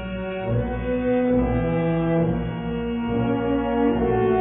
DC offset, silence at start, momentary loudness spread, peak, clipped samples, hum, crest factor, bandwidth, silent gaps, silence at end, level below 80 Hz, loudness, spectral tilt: under 0.1%; 0 s; 6 LU; -10 dBFS; under 0.1%; none; 12 dB; 3.9 kHz; none; 0 s; -36 dBFS; -23 LUFS; -12 dB/octave